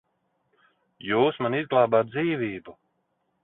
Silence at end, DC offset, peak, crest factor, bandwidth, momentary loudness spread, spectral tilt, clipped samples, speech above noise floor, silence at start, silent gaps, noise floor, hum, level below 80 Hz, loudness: 0.7 s; under 0.1%; -6 dBFS; 20 dB; 4.1 kHz; 13 LU; -10.5 dB/octave; under 0.1%; 50 dB; 1.05 s; none; -74 dBFS; none; -66 dBFS; -24 LUFS